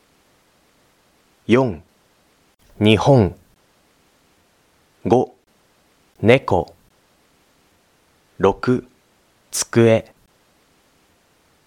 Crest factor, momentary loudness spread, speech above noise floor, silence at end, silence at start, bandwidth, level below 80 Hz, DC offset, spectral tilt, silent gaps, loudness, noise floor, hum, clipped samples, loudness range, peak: 22 dB; 13 LU; 43 dB; 1.65 s; 1.5 s; 17 kHz; -50 dBFS; under 0.1%; -5.5 dB/octave; none; -18 LUFS; -59 dBFS; none; under 0.1%; 3 LU; 0 dBFS